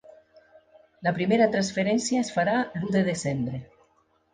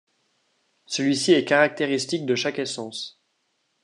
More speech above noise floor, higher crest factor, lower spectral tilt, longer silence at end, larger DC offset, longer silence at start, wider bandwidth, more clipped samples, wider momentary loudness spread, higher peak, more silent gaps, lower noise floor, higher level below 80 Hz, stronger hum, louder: second, 41 dB vs 50 dB; about the same, 18 dB vs 22 dB; first, -5.5 dB/octave vs -3.5 dB/octave; about the same, 0.7 s vs 0.75 s; neither; second, 0.1 s vs 0.9 s; second, 9.8 kHz vs 11 kHz; neither; second, 8 LU vs 14 LU; second, -8 dBFS vs -4 dBFS; neither; second, -66 dBFS vs -72 dBFS; first, -62 dBFS vs -76 dBFS; neither; about the same, -25 LUFS vs -23 LUFS